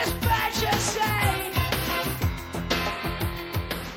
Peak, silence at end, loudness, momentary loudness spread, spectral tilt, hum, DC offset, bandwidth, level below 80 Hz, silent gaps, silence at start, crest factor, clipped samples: -10 dBFS; 0 s; -26 LUFS; 7 LU; -4 dB/octave; none; under 0.1%; 17 kHz; -38 dBFS; none; 0 s; 16 dB; under 0.1%